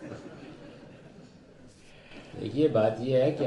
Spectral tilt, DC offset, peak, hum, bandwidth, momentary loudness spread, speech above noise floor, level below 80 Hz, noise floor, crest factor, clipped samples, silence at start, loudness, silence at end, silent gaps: -8 dB/octave; under 0.1%; -12 dBFS; none; 10.5 kHz; 25 LU; 27 dB; -62 dBFS; -53 dBFS; 18 dB; under 0.1%; 0 s; -27 LUFS; 0 s; none